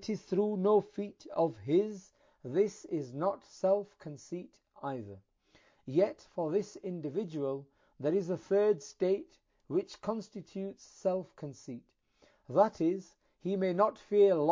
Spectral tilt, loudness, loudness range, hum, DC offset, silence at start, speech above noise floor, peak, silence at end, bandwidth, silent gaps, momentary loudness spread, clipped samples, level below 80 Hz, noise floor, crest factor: -7 dB/octave; -33 LUFS; 5 LU; none; under 0.1%; 0 s; 36 dB; -14 dBFS; 0 s; 7.6 kHz; none; 15 LU; under 0.1%; -74 dBFS; -68 dBFS; 20 dB